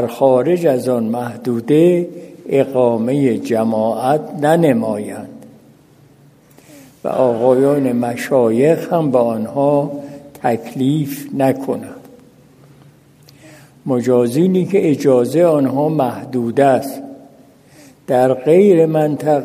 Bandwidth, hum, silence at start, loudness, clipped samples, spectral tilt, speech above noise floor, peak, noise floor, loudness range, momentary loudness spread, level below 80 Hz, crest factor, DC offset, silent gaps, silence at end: 15.5 kHz; none; 0 s; -15 LUFS; under 0.1%; -7.5 dB/octave; 33 dB; 0 dBFS; -47 dBFS; 5 LU; 12 LU; -62 dBFS; 16 dB; under 0.1%; none; 0 s